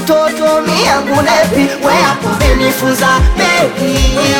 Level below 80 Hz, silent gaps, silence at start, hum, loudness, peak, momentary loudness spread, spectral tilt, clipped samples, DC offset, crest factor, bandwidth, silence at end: -18 dBFS; none; 0 s; none; -11 LUFS; 0 dBFS; 2 LU; -4 dB/octave; under 0.1%; under 0.1%; 10 dB; 18.5 kHz; 0 s